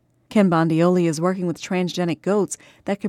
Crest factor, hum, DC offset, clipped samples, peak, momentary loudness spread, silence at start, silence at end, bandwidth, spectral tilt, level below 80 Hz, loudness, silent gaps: 16 dB; none; under 0.1%; under 0.1%; -4 dBFS; 9 LU; 0.3 s; 0 s; 13.5 kHz; -6.5 dB/octave; -64 dBFS; -21 LUFS; none